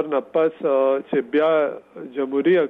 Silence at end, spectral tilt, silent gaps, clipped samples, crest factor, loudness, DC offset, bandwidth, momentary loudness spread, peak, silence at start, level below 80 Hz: 0 s; -8.5 dB/octave; none; under 0.1%; 12 dB; -21 LUFS; under 0.1%; 4.1 kHz; 9 LU; -8 dBFS; 0 s; -74 dBFS